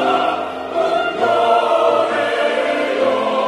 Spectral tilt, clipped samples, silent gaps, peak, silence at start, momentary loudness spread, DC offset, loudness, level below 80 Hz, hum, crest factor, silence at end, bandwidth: -4 dB/octave; under 0.1%; none; -2 dBFS; 0 s; 6 LU; under 0.1%; -17 LUFS; -62 dBFS; none; 14 dB; 0 s; 12 kHz